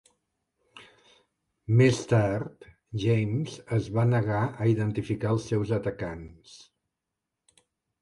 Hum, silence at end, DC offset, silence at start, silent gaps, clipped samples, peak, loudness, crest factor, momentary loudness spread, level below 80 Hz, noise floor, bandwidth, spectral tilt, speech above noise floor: none; 1.45 s; under 0.1%; 0.75 s; none; under 0.1%; -10 dBFS; -27 LUFS; 18 dB; 15 LU; -54 dBFS; -86 dBFS; 11 kHz; -7.5 dB/octave; 59 dB